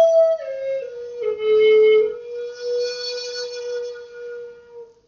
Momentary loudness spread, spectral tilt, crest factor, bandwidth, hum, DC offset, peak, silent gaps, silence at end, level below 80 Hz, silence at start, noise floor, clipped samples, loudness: 20 LU; 1 dB/octave; 14 dB; 7 kHz; none; under 0.1%; -8 dBFS; none; 0.25 s; -66 dBFS; 0 s; -42 dBFS; under 0.1%; -20 LUFS